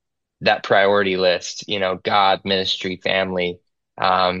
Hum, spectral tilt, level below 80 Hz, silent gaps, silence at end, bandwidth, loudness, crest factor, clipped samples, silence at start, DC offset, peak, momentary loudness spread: none; -4 dB/octave; -62 dBFS; none; 0 s; 8 kHz; -19 LUFS; 16 dB; under 0.1%; 0.4 s; under 0.1%; -4 dBFS; 7 LU